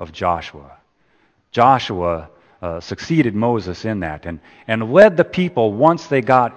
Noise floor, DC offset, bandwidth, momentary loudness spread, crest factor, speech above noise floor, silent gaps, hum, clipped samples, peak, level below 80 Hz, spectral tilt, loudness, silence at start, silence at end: -59 dBFS; under 0.1%; 8.6 kHz; 17 LU; 18 dB; 43 dB; none; none; under 0.1%; 0 dBFS; -48 dBFS; -7 dB/octave; -17 LUFS; 0 s; 0 s